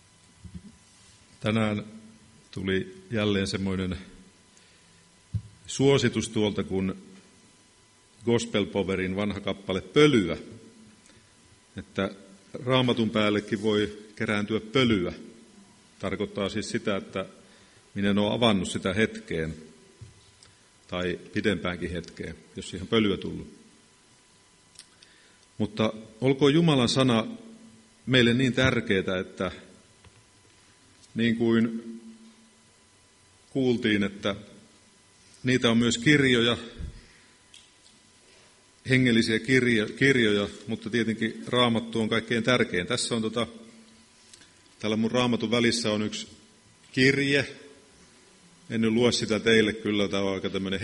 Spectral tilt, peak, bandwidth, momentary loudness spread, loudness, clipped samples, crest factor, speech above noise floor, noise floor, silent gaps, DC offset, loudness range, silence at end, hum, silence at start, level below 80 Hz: -5 dB/octave; -6 dBFS; 11.5 kHz; 16 LU; -26 LUFS; under 0.1%; 22 dB; 34 dB; -59 dBFS; none; under 0.1%; 7 LU; 0 s; none; 0.45 s; -56 dBFS